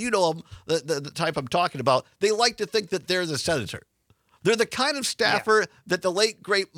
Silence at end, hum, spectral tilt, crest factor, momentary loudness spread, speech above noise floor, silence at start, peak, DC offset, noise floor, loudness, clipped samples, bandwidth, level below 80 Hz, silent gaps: 0.15 s; none; -3 dB/octave; 20 dB; 7 LU; 39 dB; 0 s; -6 dBFS; under 0.1%; -64 dBFS; -24 LUFS; under 0.1%; 16.5 kHz; -62 dBFS; none